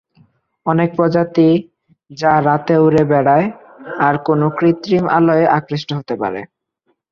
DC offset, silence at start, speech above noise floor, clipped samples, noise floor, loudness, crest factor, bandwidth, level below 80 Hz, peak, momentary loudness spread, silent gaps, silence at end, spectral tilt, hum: under 0.1%; 0.65 s; 52 dB; under 0.1%; -66 dBFS; -15 LUFS; 14 dB; 7 kHz; -54 dBFS; -2 dBFS; 11 LU; none; 0.65 s; -8 dB/octave; none